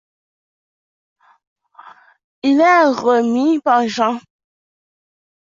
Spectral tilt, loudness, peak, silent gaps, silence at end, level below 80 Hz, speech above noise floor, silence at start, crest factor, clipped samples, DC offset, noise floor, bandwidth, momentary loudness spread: -4.5 dB/octave; -15 LUFS; -2 dBFS; none; 1.4 s; -68 dBFS; 30 dB; 2.45 s; 16 dB; under 0.1%; under 0.1%; -44 dBFS; 7.6 kHz; 8 LU